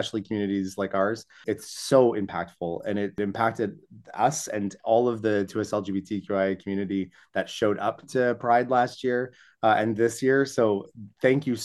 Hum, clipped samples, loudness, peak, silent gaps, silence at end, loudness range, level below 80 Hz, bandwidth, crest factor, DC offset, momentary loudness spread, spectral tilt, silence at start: none; under 0.1%; -26 LUFS; -6 dBFS; none; 0 s; 3 LU; -68 dBFS; 12.5 kHz; 20 dB; under 0.1%; 10 LU; -5.5 dB/octave; 0 s